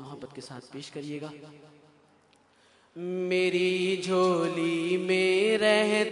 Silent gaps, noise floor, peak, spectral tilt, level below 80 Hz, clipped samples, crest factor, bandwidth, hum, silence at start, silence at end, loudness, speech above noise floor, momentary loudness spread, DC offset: none; -63 dBFS; -8 dBFS; -5 dB/octave; -76 dBFS; under 0.1%; 20 dB; 11 kHz; none; 0 s; 0 s; -26 LUFS; 36 dB; 20 LU; under 0.1%